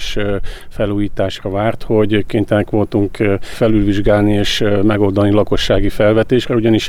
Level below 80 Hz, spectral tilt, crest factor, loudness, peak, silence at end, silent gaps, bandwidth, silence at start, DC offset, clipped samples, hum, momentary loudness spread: -26 dBFS; -6.5 dB/octave; 12 dB; -15 LUFS; -2 dBFS; 0 s; none; 14.5 kHz; 0 s; under 0.1%; under 0.1%; none; 6 LU